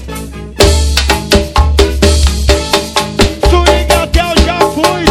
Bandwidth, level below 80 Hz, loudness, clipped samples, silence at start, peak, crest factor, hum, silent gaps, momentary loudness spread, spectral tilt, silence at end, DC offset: 16.5 kHz; -14 dBFS; -10 LUFS; 2%; 0 s; 0 dBFS; 10 dB; none; none; 3 LU; -4.5 dB/octave; 0 s; under 0.1%